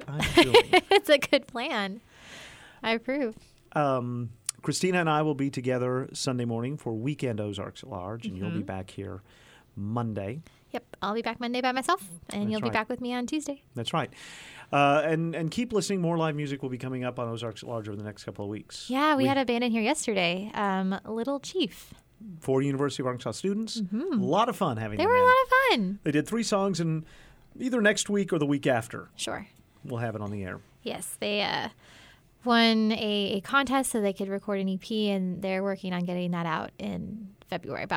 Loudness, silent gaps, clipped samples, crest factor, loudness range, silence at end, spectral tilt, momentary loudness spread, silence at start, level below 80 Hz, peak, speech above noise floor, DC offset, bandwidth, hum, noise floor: -28 LUFS; none; under 0.1%; 22 dB; 8 LU; 0 s; -4.5 dB/octave; 16 LU; 0 s; -58 dBFS; -8 dBFS; 20 dB; under 0.1%; 17 kHz; none; -48 dBFS